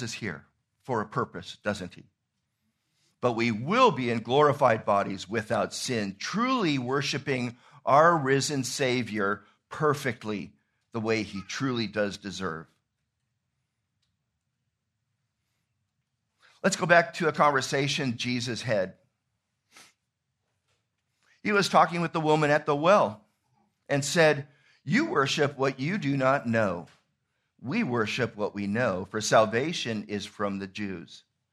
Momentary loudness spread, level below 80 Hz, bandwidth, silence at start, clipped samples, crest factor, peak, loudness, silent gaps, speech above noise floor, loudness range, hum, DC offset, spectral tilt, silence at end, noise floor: 13 LU; -70 dBFS; 13.5 kHz; 0 s; under 0.1%; 24 dB; -4 dBFS; -27 LUFS; none; 54 dB; 8 LU; none; under 0.1%; -4.5 dB/octave; 0.35 s; -81 dBFS